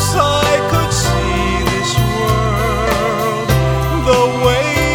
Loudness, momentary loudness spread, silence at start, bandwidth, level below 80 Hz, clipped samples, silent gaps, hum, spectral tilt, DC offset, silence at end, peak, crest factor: -14 LUFS; 3 LU; 0 s; over 20 kHz; -24 dBFS; under 0.1%; none; none; -4.5 dB/octave; under 0.1%; 0 s; 0 dBFS; 14 dB